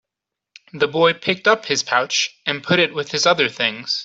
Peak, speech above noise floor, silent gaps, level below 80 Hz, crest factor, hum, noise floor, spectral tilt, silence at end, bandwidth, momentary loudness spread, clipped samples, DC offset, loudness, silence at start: -2 dBFS; 65 dB; none; -64 dBFS; 18 dB; none; -84 dBFS; -2.5 dB/octave; 0 s; 8 kHz; 5 LU; under 0.1%; under 0.1%; -18 LUFS; 0.75 s